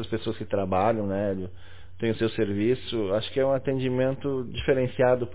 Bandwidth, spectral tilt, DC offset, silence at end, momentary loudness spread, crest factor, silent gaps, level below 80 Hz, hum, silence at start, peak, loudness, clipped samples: 4 kHz; -11 dB/octave; 1%; 0 s; 7 LU; 16 dB; none; -48 dBFS; none; 0 s; -10 dBFS; -27 LUFS; under 0.1%